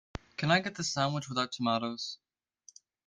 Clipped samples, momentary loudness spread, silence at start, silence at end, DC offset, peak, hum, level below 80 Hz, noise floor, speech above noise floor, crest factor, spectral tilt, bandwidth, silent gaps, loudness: under 0.1%; 12 LU; 0.4 s; 0.9 s; under 0.1%; -12 dBFS; none; -62 dBFS; -63 dBFS; 31 dB; 22 dB; -4 dB/octave; 10 kHz; none; -32 LUFS